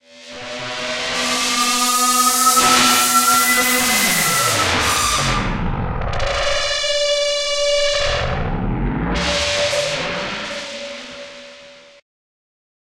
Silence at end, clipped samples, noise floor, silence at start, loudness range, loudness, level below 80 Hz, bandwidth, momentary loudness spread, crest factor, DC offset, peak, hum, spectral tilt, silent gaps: 1.2 s; under 0.1%; -42 dBFS; 0.15 s; 9 LU; -16 LUFS; -32 dBFS; 16 kHz; 15 LU; 16 dB; under 0.1%; -2 dBFS; none; -2 dB/octave; none